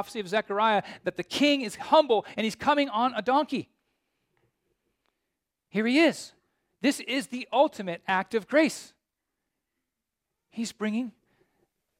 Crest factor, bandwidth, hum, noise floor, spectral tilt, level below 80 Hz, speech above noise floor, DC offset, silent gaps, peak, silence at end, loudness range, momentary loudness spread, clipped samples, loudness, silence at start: 20 dB; 16 kHz; none; -85 dBFS; -4 dB/octave; -72 dBFS; 59 dB; under 0.1%; none; -8 dBFS; 0.9 s; 6 LU; 12 LU; under 0.1%; -26 LUFS; 0 s